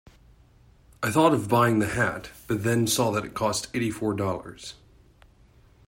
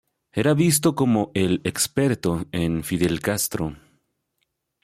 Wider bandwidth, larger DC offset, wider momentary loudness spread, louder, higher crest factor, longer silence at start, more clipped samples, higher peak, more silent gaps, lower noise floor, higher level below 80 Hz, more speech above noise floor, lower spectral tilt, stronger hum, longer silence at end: about the same, 16.5 kHz vs 16.5 kHz; neither; first, 14 LU vs 7 LU; second, -25 LUFS vs -22 LUFS; about the same, 20 dB vs 16 dB; first, 1 s vs 0.35 s; neither; about the same, -6 dBFS vs -8 dBFS; neither; second, -56 dBFS vs -75 dBFS; about the same, -54 dBFS vs -50 dBFS; second, 32 dB vs 53 dB; about the same, -5 dB/octave vs -5 dB/octave; neither; about the same, 1.15 s vs 1.05 s